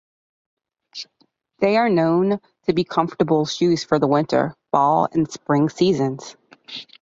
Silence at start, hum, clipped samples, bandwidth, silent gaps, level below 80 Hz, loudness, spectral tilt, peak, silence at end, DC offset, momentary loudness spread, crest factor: 0.95 s; none; under 0.1%; 7.8 kHz; none; -60 dBFS; -20 LUFS; -6 dB/octave; -2 dBFS; 0.2 s; under 0.1%; 18 LU; 18 dB